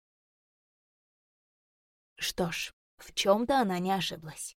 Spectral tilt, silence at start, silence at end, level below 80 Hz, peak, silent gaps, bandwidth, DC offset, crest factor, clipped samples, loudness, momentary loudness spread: -4 dB/octave; 2.2 s; 0.05 s; -62 dBFS; -10 dBFS; 2.73-2.98 s; 17 kHz; under 0.1%; 24 dB; under 0.1%; -30 LUFS; 11 LU